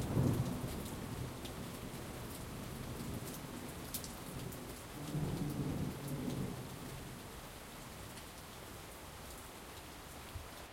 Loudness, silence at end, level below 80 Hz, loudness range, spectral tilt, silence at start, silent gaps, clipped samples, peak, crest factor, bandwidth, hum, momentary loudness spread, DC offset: -44 LUFS; 0 s; -56 dBFS; 7 LU; -5.5 dB/octave; 0 s; none; under 0.1%; -20 dBFS; 22 dB; 16.5 kHz; none; 10 LU; under 0.1%